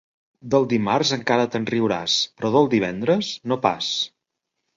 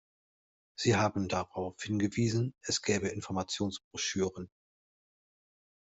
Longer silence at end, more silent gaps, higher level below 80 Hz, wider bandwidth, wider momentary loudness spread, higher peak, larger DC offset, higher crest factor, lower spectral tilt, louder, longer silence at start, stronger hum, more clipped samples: second, 0.7 s vs 1.45 s; second, none vs 3.84-3.91 s; first, -60 dBFS vs -66 dBFS; about the same, 7.6 kHz vs 8.2 kHz; second, 4 LU vs 9 LU; first, -2 dBFS vs -14 dBFS; neither; about the same, 22 dB vs 20 dB; about the same, -4.5 dB/octave vs -4.5 dB/octave; first, -21 LUFS vs -33 LUFS; second, 0.45 s vs 0.8 s; neither; neither